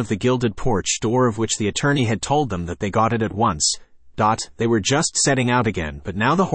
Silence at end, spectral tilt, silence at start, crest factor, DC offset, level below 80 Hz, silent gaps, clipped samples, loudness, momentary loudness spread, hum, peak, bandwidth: 0 s; -4 dB/octave; 0 s; 14 dB; under 0.1%; -42 dBFS; none; under 0.1%; -20 LUFS; 6 LU; none; -6 dBFS; 8.8 kHz